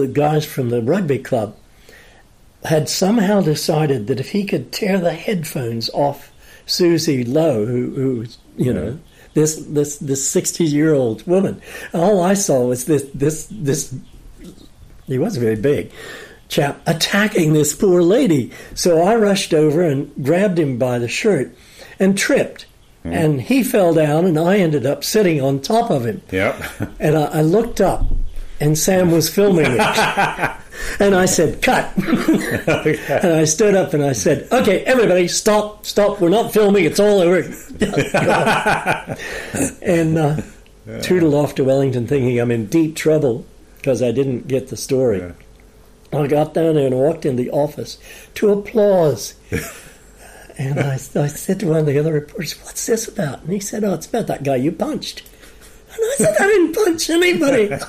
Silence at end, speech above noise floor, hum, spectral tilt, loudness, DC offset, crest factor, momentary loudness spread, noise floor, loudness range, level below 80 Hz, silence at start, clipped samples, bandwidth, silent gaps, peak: 0 s; 31 dB; none; -5 dB/octave; -17 LUFS; under 0.1%; 14 dB; 11 LU; -47 dBFS; 5 LU; -38 dBFS; 0 s; under 0.1%; 15.5 kHz; none; -4 dBFS